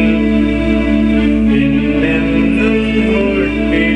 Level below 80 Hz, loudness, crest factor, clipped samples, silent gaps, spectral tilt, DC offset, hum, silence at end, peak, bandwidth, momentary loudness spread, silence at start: -24 dBFS; -13 LUFS; 10 dB; under 0.1%; none; -7.5 dB/octave; under 0.1%; none; 0 s; -2 dBFS; 9.4 kHz; 2 LU; 0 s